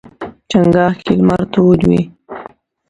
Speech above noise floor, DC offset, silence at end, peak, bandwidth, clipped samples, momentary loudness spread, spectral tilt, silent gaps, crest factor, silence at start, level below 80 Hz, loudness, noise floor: 25 dB; under 0.1%; 0.45 s; 0 dBFS; 7.8 kHz; under 0.1%; 20 LU; -8 dB/octave; none; 14 dB; 0.2 s; -40 dBFS; -13 LUFS; -36 dBFS